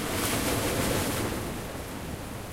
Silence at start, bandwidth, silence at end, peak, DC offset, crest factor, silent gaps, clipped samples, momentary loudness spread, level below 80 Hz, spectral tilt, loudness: 0 s; 16 kHz; 0 s; -14 dBFS; under 0.1%; 16 dB; none; under 0.1%; 10 LU; -42 dBFS; -4 dB/octave; -30 LUFS